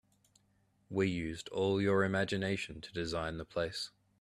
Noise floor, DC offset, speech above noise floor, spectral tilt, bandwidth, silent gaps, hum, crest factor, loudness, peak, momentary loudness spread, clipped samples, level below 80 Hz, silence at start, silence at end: -73 dBFS; under 0.1%; 38 dB; -5.5 dB/octave; 13 kHz; none; none; 18 dB; -35 LUFS; -18 dBFS; 10 LU; under 0.1%; -60 dBFS; 0.9 s; 0.35 s